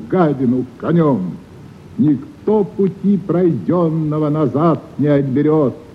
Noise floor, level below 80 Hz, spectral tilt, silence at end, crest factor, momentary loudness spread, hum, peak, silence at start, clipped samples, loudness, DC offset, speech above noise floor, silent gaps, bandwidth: -37 dBFS; -52 dBFS; -10.5 dB/octave; 0 s; 12 dB; 5 LU; none; -4 dBFS; 0 s; under 0.1%; -16 LUFS; under 0.1%; 21 dB; none; 6 kHz